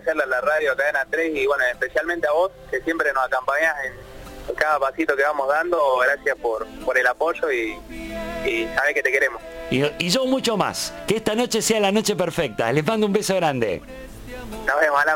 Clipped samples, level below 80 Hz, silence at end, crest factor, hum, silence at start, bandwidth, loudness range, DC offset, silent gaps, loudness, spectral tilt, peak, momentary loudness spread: under 0.1%; -46 dBFS; 0 s; 18 dB; none; 0 s; 17 kHz; 1 LU; under 0.1%; none; -21 LUFS; -3.5 dB/octave; -4 dBFS; 11 LU